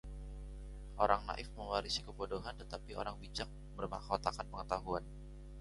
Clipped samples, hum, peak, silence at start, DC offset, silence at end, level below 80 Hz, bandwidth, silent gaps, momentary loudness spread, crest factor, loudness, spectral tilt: under 0.1%; none; -14 dBFS; 0.05 s; under 0.1%; 0 s; -50 dBFS; 11.5 kHz; none; 16 LU; 26 dB; -41 LUFS; -4.5 dB/octave